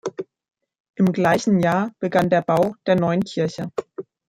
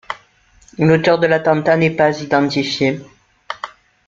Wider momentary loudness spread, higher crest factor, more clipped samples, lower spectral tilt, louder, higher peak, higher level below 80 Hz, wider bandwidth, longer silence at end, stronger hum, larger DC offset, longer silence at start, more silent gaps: about the same, 16 LU vs 17 LU; about the same, 16 dB vs 16 dB; neither; about the same, -6.5 dB/octave vs -6 dB/octave; second, -20 LUFS vs -15 LUFS; about the same, -4 dBFS vs -2 dBFS; second, -60 dBFS vs -52 dBFS; first, 15.5 kHz vs 7.6 kHz; second, 0.25 s vs 0.4 s; neither; neither; about the same, 0.05 s vs 0.1 s; first, 0.80-0.84 s, 0.90-0.94 s vs none